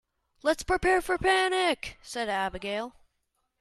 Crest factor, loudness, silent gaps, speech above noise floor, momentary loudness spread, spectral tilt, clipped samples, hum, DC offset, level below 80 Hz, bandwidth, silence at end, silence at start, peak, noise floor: 18 dB; -28 LUFS; none; 50 dB; 11 LU; -3.5 dB/octave; under 0.1%; none; under 0.1%; -50 dBFS; 14.5 kHz; 0.7 s; 0.45 s; -12 dBFS; -78 dBFS